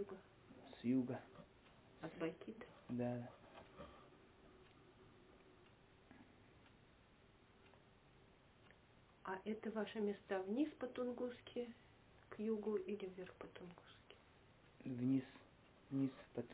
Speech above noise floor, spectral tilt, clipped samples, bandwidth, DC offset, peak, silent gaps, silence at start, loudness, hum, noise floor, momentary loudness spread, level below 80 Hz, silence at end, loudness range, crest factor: 25 dB; -6.5 dB/octave; under 0.1%; 4 kHz; under 0.1%; -30 dBFS; none; 0 s; -46 LUFS; none; -69 dBFS; 26 LU; -76 dBFS; 0 s; 21 LU; 20 dB